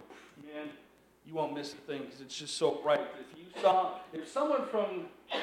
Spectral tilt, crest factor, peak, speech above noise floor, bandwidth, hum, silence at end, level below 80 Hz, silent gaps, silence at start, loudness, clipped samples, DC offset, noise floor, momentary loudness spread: -4 dB/octave; 20 dB; -14 dBFS; 27 dB; 13.5 kHz; none; 0 s; -78 dBFS; none; 0 s; -34 LUFS; under 0.1%; under 0.1%; -60 dBFS; 18 LU